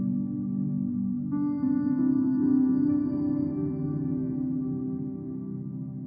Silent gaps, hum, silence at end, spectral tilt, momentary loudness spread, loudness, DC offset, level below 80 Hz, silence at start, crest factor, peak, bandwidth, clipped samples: none; none; 0 s; -14 dB/octave; 11 LU; -28 LUFS; under 0.1%; -60 dBFS; 0 s; 14 dB; -14 dBFS; 2.2 kHz; under 0.1%